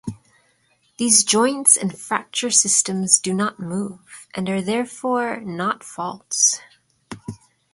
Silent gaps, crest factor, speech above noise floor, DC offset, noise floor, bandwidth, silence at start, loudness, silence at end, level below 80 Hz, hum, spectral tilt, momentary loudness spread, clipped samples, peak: none; 22 dB; 42 dB; under 0.1%; -63 dBFS; 12 kHz; 0.05 s; -18 LUFS; 0.4 s; -60 dBFS; none; -2 dB/octave; 19 LU; under 0.1%; 0 dBFS